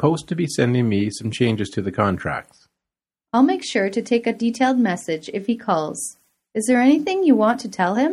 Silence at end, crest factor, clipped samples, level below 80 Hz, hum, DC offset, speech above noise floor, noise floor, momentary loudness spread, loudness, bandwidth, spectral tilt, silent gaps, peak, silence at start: 0 s; 18 dB; under 0.1%; -56 dBFS; none; under 0.1%; 68 dB; -88 dBFS; 9 LU; -20 LUFS; 13.5 kHz; -5.5 dB/octave; none; -4 dBFS; 0 s